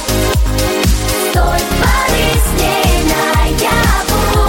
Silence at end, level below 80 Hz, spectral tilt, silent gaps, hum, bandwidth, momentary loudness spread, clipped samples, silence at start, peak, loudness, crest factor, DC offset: 0 s; -16 dBFS; -4 dB/octave; none; none; 17 kHz; 2 LU; under 0.1%; 0 s; 0 dBFS; -13 LUFS; 12 dB; under 0.1%